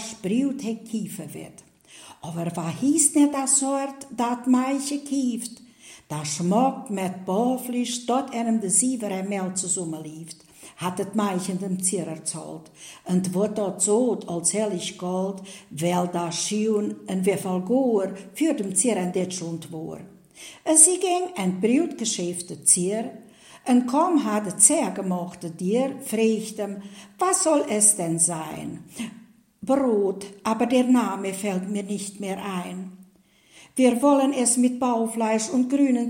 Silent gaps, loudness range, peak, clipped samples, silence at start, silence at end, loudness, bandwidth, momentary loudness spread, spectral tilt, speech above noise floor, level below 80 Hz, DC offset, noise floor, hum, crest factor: none; 5 LU; 0 dBFS; under 0.1%; 0 s; 0 s; -23 LUFS; 16.5 kHz; 17 LU; -4 dB/octave; 34 dB; -70 dBFS; under 0.1%; -58 dBFS; none; 24 dB